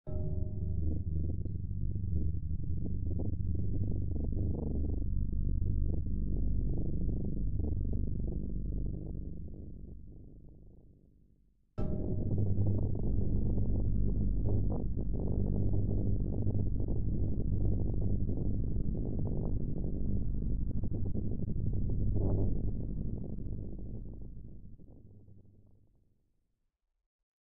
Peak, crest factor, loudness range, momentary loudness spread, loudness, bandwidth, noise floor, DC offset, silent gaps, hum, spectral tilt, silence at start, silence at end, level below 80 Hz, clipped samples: -18 dBFS; 14 dB; 10 LU; 13 LU; -36 LUFS; 1.4 kHz; -81 dBFS; 2%; 27.06-27.19 s; none; -15.5 dB/octave; 0.05 s; 0.2 s; -38 dBFS; under 0.1%